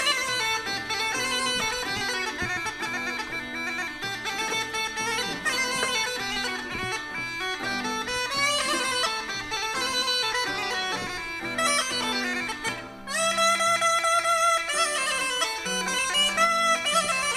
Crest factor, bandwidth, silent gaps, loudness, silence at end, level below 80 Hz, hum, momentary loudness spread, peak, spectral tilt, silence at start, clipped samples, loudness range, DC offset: 18 dB; 15.5 kHz; none; -25 LUFS; 0 s; -54 dBFS; none; 8 LU; -10 dBFS; -1 dB/octave; 0 s; under 0.1%; 5 LU; under 0.1%